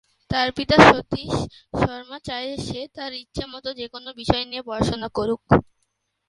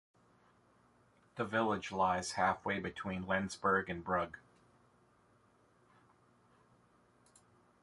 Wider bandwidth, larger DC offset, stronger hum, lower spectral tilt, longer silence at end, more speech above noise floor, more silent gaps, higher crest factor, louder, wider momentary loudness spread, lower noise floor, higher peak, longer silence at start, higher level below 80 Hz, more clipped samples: about the same, 11.5 kHz vs 11.5 kHz; neither; neither; about the same, -5.5 dB/octave vs -4.5 dB/octave; second, 0.65 s vs 3.45 s; first, 51 dB vs 34 dB; neither; about the same, 22 dB vs 22 dB; first, -22 LUFS vs -36 LUFS; first, 18 LU vs 9 LU; about the same, -73 dBFS vs -70 dBFS; first, 0 dBFS vs -18 dBFS; second, 0.3 s vs 1.35 s; first, -42 dBFS vs -66 dBFS; neither